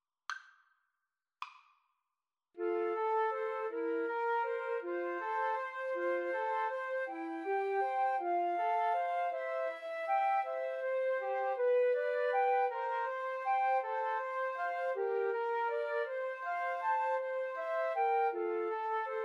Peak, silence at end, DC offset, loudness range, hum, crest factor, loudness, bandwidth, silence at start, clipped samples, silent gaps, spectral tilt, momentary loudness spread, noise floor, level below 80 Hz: -22 dBFS; 0 s; under 0.1%; 3 LU; none; 14 dB; -35 LUFS; 7.4 kHz; 0.3 s; under 0.1%; none; -2 dB/octave; 6 LU; under -90 dBFS; under -90 dBFS